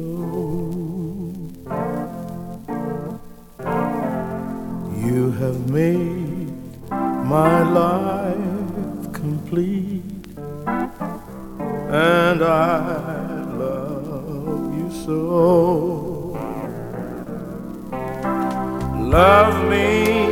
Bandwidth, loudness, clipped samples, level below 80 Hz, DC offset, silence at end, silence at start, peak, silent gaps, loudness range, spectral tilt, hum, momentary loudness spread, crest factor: 17.5 kHz; -21 LUFS; under 0.1%; -40 dBFS; under 0.1%; 0 s; 0 s; 0 dBFS; none; 7 LU; -7 dB/octave; none; 15 LU; 20 dB